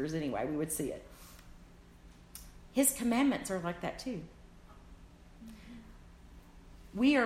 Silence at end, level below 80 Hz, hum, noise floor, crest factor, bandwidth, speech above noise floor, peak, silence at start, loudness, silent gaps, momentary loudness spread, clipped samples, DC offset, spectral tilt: 0 s; -56 dBFS; none; -56 dBFS; 22 dB; 16 kHz; 24 dB; -14 dBFS; 0 s; -33 LUFS; none; 25 LU; under 0.1%; under 0.1%; -4 dB/octave